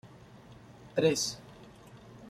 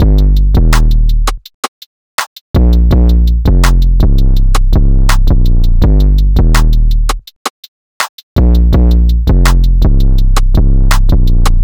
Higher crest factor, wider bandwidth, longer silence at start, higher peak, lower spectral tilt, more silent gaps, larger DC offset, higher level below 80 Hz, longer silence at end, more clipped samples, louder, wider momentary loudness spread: first, 22 dB vs 6 dB; about the same, 15.5 kHz vs 16.5 kHz; about the same, 0.05 s vs 0 s; second, -14 dBFS vs 0 dBFS; second, -3.5 dB/octave vs -6 dB/octave; second, none vs 1.54-2.18 s, 2.27-2.54 s, 7.36-8.00 s, 8.09-8.36 s; neither; second, -66 dBFS vs -8 dBFS; about the same, 0 s vs 0 s; neither; second, -30 LUFS vs -11 LUFS; first, 25 LU vs 10 LU